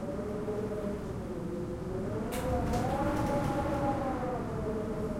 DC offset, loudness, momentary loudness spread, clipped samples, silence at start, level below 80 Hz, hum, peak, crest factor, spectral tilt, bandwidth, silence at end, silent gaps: under 0.1%; -34 LUFS; 6 LU; under 0.1%; 0 s; -44 dBFS; none; -18 dBFS; 14 dB; -7 dB/octave; 16.5 kHz; 0 s; none